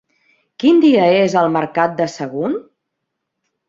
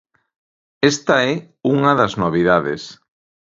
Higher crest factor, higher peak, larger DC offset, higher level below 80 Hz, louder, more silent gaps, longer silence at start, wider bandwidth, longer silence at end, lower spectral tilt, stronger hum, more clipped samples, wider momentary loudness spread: about the same, 14 dB vs 18 dB; about the same, -2 dBFS vs 0 dBFS; neither; second, -62 dBFS vs -52 dBFS; about the same, -15 LUFS vs -17 LUFS; neither; second, 0.6 s vs 0.8 s; about the same, 7.6 kHz vs 7.8 kHz; first, 1.05 s vs 0.5 s; about the same, -6 dB/octave vs -5 dB/octave; neither; neither; about the same, 11 LU vs 10 LU